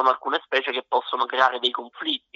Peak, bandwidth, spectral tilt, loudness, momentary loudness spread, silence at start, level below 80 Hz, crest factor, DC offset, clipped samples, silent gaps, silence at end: -4 dBFS; 7.8 kHz; -2.5 dB/octave; -23 LUFS; 7 LU; 0 s; -82 dBFS; 20 dB; under 0.1%; under 0.1%; none; 0.2 s